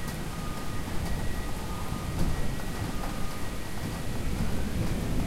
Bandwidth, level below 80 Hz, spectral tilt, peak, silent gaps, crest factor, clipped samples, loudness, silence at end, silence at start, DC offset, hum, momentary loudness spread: 16 kHz; -34 dBFS; -5.5 dB/octave; -14 dBFS; none; 16 dB; under 0.1%; -34 LUFS; 0 s; 0 s; under 0.1%; none; 4 LU